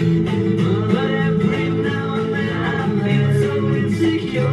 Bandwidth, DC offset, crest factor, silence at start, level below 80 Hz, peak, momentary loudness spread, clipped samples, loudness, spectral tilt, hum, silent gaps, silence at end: 11 kHz; under 0.1%; 14 dB; 0 s; -48 dBFS; -4 dBFS; 3 LU; under 0.1%; -19 LUFS; -8 dB/octave; none; none; 0 s